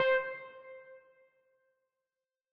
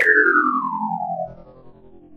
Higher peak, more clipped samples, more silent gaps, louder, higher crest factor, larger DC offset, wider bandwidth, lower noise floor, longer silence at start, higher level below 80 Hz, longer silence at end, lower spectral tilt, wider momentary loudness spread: second, -18 dBFS vs -2 dBFS; neither; neither; second, -34 LUFS vs -19 LUFS; about the same, 20 dB vs 18 dB; neither; second, 5.6 kHz vs 12.5 kHz; first, under -90 dBFS vs -44 dBFS; about the same, 0 s vs 0 s; second, -80 dBFS vs -56 dBFS; first, 1.55 s vs 0 s; second, -4 dB/octave vs -6.5 dB/octave; first, 26 LU vs 15 LU